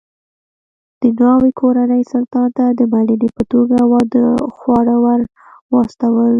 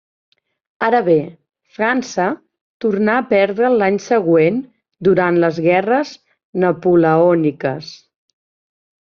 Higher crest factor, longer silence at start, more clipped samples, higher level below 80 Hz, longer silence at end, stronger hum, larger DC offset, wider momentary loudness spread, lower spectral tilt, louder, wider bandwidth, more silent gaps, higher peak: about the same, 12 dB vs 14 dB; first, 1 s vs 0.8 s; neither; first, -48 dBFS vs -58 dBFS; second, 0 s vs 1.05 s; neither; neither; second, 6 LU vs 11 LU; first, -9 dB/octave vs -5.5 dB/octave; about the same, -14 LUFS vs -16 LUFS; second, 5.8 kHz vs 7.2 kHz; second, 5.61-5.69 s vs 2.61-2.80 s, 6.44-6.53 s; about the same, 0 dBFS vs -2 dBFS